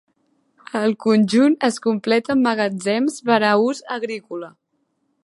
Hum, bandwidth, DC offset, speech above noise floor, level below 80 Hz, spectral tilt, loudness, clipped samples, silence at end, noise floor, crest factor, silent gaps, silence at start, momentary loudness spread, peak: none; 11.5 kHz; under 0.1%; 51 dB; -68 dBFS; -5 dB/octave; -19 LUFS; under 0.1%; 0.75 s; -69 dBFS; 18 dB; none; 0.75 s; 13 LU; -2 dBFS